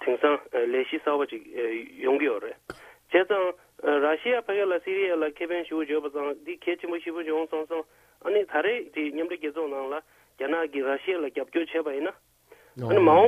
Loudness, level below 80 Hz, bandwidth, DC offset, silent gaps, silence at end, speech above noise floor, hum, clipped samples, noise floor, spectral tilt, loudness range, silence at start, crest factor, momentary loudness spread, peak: -27 LUFS; -70 dBFS; 13.5 kHz; under 0.1%; none; 0 s; 31 dB; none; under 0.1%; -57 dBFS; -6.5 dB/octave; 4 LU; 0 s; 20 dB; 10 LU; -8 dBFS